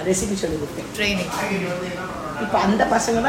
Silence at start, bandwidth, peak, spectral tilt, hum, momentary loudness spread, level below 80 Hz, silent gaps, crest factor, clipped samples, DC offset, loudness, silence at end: 0 s; 16.5 kHz; -4 dBFS; -4 dB/octave; none; 10 LU; -42 dBFS; none; 18 dB; under 0.1%; under 0.1%; -22 LUFS; 0 s